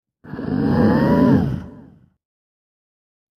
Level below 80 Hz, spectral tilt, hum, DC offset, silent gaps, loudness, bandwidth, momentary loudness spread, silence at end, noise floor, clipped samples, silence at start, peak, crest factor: -40 dBFS; -9.5 dB/octave; none; under 0.1%; none; -17 LUFS; 13 kHz; 16 LU; 1.6 s; -46 dBFS; under 0.1%; 0.25 s; -2 dBFS; 18 dB